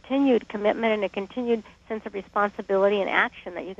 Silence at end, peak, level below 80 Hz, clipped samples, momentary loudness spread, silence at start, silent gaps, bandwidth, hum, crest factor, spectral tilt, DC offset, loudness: 0.05 s; -4 dBFS; -60 dBFS; under 0.1%; 11 LU; 0.05 s; none; 7.6 kHz; none; 20 dB; -6.5 dB/octave; under 0.1%; -25 LUFS